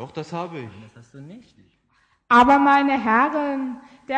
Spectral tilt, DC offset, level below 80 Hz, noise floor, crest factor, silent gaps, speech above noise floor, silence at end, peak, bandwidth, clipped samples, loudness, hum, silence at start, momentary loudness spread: -6 dB/octave; under 0.1%; -54 dBFS; -64 dBFS; 18 dB; none; 43 dB; 0 s; -4 dBFS; 9.2 kHz; under 0.1%; -18 LUFS; none; 0 s; 21 LU